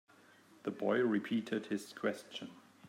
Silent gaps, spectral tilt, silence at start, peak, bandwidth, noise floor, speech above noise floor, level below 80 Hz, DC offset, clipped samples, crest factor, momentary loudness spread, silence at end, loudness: none; -5.5 dB/octave; 0.65 s; -20 dBFS; 16 kHz; -63 dBFS; 27 dB; -90 dBFS; under 0.1%; under 0.1%; 18 dB; 14 LU; 0 s; -37 LUFS